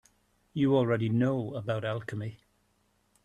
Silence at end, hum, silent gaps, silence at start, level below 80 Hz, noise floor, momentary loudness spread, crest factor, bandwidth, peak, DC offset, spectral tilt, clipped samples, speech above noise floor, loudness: 0.9 s; none; none; 0.55 s; -66 dBFS; -71 dBFS; 13 LU; 18 dB; 10.5 kHz; -14 dBFS; under 0.1%; -8.5 dB/octave; under 0.1%; 43 dB; -30 LUFS